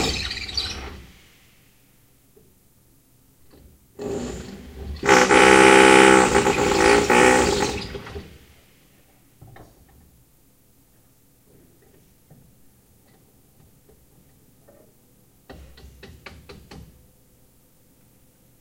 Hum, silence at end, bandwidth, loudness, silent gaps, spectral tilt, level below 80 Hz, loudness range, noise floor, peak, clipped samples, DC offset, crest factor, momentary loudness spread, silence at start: none; 1.85 s; 16 kHz; -16 LUFS; none; -3.5 dB/octave; -44 dBFS; 24 LU; -58 dBFS; 0 dBFS; under 0.1%; under 0.1%; 22 dB; 26 LU; 0 s